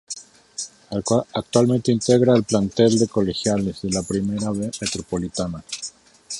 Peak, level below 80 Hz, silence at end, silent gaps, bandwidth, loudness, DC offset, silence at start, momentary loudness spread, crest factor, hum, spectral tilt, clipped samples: -2 dBFS; -48 dBFS; 0 s; none; 11.5 kHz; -21 LUFS; under 0.1%; 0.1 s; 15 LU; 18 dB; none; -5.5 dB/octave; under 0.1%